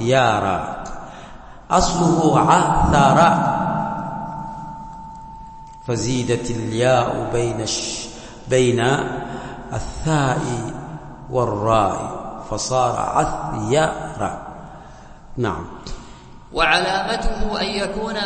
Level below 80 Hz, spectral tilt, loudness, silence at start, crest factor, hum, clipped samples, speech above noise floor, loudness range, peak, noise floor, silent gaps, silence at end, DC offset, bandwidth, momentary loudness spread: -34 dBFS; -5 dB/octave; -20 LUFS; 0 s; 18 dB; none; under 0.1%; 21 dB; 7 LU; -2 dBFS; -40 dBFS; none; 0 s; under 0.1%; 8.8 kHz; 20 LU